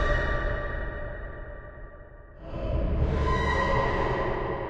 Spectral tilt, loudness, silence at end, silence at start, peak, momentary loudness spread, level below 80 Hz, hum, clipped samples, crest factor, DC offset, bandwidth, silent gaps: -7 dB/octave; -29 LUFS; 0 s; 0 s; -12 dBFS; 21 LU; -32 dBFS; none; under 0.1%; 16 dB; under 0.1%; 8.2 kHz; none